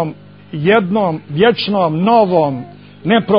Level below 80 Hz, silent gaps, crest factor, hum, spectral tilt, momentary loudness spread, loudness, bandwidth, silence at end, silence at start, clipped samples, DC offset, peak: -54 dBFS; none; 14 dB; 50 Hz at -35 dBFS; -10 dB/octave; 14 LU; -14 LUFS; 5.4 kHz; 0 s; 0 s; under 0.1%; 0.2%; 0 dBFS